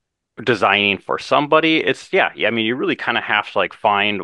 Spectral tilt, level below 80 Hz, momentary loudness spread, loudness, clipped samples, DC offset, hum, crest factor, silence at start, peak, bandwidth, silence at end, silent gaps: -5 dB/octave; -64 dBFS; 6 LU; -17 LUFS; under 0.1%; under 0.1%; none; 18 dB; 0.4 s; 0 dBFS; 11 kHz; 0 s; none